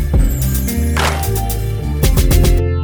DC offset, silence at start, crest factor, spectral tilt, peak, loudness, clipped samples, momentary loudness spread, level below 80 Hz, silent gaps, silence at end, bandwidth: under 0.1%; 0 s; 12 dB; -5.5 dB/octave; 0 dBFS; -16 LUFS; under 0.1%; 6 LU; -16 dBFS; none; 0 s; over 20 kHz